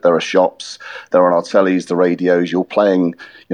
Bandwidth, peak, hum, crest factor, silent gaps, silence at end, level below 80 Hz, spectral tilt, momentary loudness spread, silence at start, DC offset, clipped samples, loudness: 10 kHz; -2 dBFS; none; 14 dB; none; 0 s; -66 dBFS; -6 dB/octave; 14 LU; 0.05 s; under 0.1%; under 0.1%; -15 LUFS